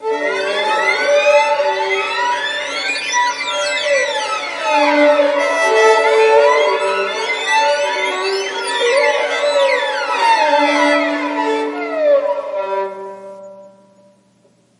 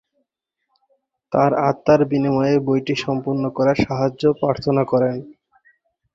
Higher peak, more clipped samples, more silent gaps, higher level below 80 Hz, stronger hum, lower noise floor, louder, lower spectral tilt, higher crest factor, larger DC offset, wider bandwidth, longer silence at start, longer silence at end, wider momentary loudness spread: about the same, 0 dBFS vs -2 dBFS; neither; neither; second, -76 dBFS vs -52 dBFS; neither; second, -54 dBFS vs -77 dBFS; first, -15 LUFS vs -19 LUFS; second, -1 dB/octave vs -7.5 dB/octave; about the same, 16 dB vs 18 dB; neither; first, 11 kHz vs 7.6 kHz; second, 0 s vs 1.3 s; first, 1.1 s vs 0.85 s; about the same, 8 LU vs 6 LU